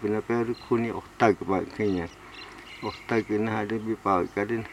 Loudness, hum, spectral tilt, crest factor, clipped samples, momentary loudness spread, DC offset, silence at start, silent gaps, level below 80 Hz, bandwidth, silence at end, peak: -28 LUFS; none; -7 dB/octave; 22 dB; under 0.1%; 14 LU; under 0.1%; 0 s; none; -56 dBFS; 13.5 kHz; 0 s; -6 dBFS